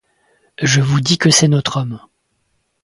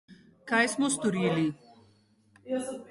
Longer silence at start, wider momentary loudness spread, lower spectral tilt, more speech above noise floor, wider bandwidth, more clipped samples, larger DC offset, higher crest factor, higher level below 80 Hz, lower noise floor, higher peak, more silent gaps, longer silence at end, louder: first, 0.6 s vs 0.1 s; about the same, 13 LU vs 12 LU; about the same, -4 dB/octave vs -4.5 dB/octave; first, 52 dB vs 36 dB; about the same, 11.5 kHz vs 11.5 kHz; neither; neither; about the same, 16 dB vs 18 dB; first, -50 dBFS vs -70 dBFS; about the same, -66 dBFS vs -64 dBFS; first, 0 dBFS vs -12 dBFS; neither; first, 0.85 s vs 0.05 s; first, -14 LUFS vs -28 LUFS